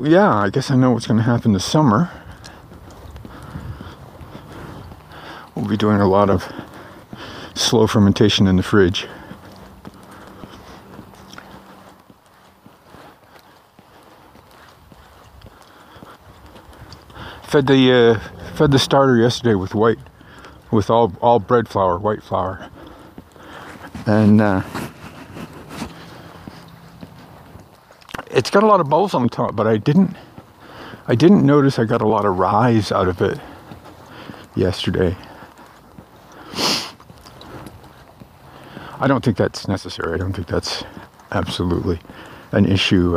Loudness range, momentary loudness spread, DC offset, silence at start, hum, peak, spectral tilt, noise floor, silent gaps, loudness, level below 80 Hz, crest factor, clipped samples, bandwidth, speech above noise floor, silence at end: 11 LU; 25 LU; under 0.1%; 0 s; none; -2 dBFS; -6 dB/octave; -50 dBFS; none; -17 LUFS; -46 dBFS; 18 dB; under 0.1%; 15.5 kHz; 34 dB; 0 s